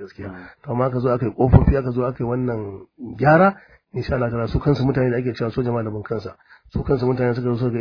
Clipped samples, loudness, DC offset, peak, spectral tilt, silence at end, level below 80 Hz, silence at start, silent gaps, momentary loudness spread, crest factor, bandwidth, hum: under 0.1%; -20 LUFS; under 0.1%; 0 dBFS; -10 dB/octave; 0 s; -34 dBFS; 0 s; none; 19 LU; 20 dB; 5.4 kHz; none